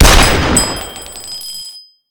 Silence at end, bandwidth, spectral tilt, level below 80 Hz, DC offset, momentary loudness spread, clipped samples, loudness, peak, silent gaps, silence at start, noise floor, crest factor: 0.3 s; over 20 kHz; -3 dB/octave; -18 dBFS; under 0.1%; 18 LU; 0.5%; -13 LUFS; 0 dBFS; none; 0 s; -34 dBFS; 12 dB